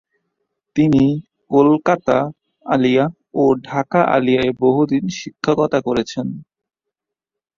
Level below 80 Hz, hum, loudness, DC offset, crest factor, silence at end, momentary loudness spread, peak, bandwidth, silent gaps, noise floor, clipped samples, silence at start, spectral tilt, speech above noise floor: -52 dBFS; none; -17 LUFS; under 0.1%; 16 dB; 1.15 s; 12 LU; -2 dBFS; 7.4 kHz; none; -84 dBFS; under 0.1%; 0.75 s; -7 dB/octave; 68 dB